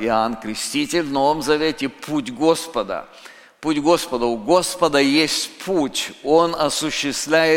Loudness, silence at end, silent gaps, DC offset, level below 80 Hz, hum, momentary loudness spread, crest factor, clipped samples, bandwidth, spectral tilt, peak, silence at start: -20 LUFS; 0 s; none; under 0.1%; -50 dBFS; none; 9 LU; 18 dB; under 0.1%; 17 kHz; -3.5 dB/octave; -2 dBFS; 0 s